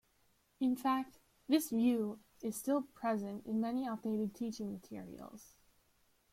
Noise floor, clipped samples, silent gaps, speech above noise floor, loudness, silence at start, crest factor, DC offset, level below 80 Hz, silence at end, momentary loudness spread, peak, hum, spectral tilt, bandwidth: -74 dBFS; under 0.1%; none; 37 dB; -37 LUFS; 0.6 s; 20 dB; under 0.1%; -74 dBFS; 0.9 s; 16 LU; -18 dBFS; none; -5.5 dB/octave; 16.5 kHz